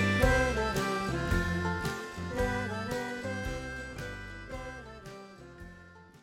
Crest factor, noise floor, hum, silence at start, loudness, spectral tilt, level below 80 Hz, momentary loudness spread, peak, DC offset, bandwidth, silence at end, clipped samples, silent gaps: 22 dB; -53 dBFS; none; 0 s; -32 LUFS; -5.5 dB/octave; -42 dBFS; 21 LU; -10 dBFS; under 0.1%; 16 kHz; 0.05 s; under 0.1%; none